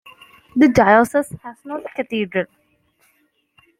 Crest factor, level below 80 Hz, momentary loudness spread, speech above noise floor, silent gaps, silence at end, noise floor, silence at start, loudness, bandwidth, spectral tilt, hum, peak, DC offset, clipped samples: 18 dB; -50 dBFS; 18 LU; 46 dB; none; 1.35 s; -63 dBFS; 0.55 s; -17 LUFS; 15.5 kHz; -6 dB/octave; none; -2 dBFS; under 0.1%; under 0.1%